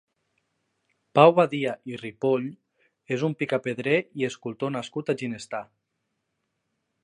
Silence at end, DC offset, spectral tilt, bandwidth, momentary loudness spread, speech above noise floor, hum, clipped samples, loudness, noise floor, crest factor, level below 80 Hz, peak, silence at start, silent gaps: 1.4 s; under 0.1%; -6.5 dB/octave; 10.5 kHz; 17 LU; 54 dB; none; under 0.1%; -25 LUFS; -79 dBFS; 24 dB; -74 dBFS; -4 dBFS; 1.15 s; none